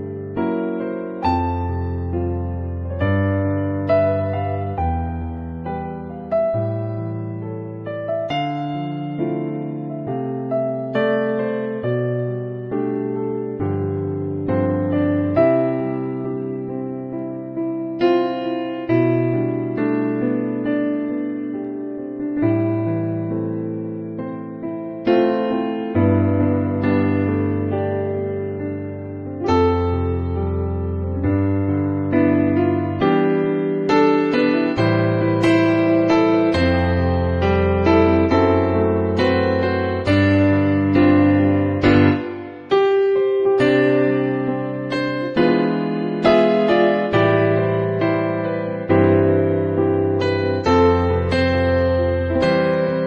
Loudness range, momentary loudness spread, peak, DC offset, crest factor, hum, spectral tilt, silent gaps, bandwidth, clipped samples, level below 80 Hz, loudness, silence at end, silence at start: 7 LU; 11 LU; -2 dBFS; under 0.1%; 16 dB; none; -8.5 dB/octave; none; 8.4 kHz; under 0.1%; -40 dBFS; -19 LUFS; 0 s; 0 s